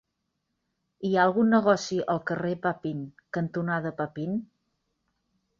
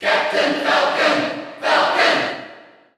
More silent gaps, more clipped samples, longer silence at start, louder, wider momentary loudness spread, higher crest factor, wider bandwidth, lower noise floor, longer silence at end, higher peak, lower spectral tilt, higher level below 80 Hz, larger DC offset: neither; neither; first, 1 s vs 0 s; second, -27 LUFS vs -17 LUFS; first, 13 LU vs 10 LU; about the same, 20 dB vs 16 dB; second, 7.4 kHz vs 13.5 kHz; first, -80 dBFS vs -44 dBFS; first, 1.15 s vs 0.4 s; second, -8 dBFS vs -4 dBFS; first, -6.5 dB/octave vs -2.5 dB/octave; about the same, -68 dBFS vs -68 dBFS; neither